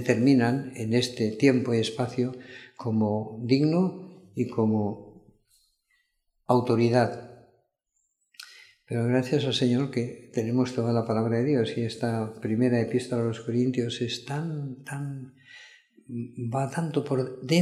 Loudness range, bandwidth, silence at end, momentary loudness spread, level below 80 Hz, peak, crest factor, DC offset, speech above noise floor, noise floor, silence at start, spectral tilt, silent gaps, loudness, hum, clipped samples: 5 LU; 13 kHz; 0 s; 15 LU; -70 dBFS; -6 dBFS; 22 dB; under 0.1%; 50 dB; -76 dBFS; 0 s; -6.5 dB/octave; none; -27 LUFS; none; under 0.1%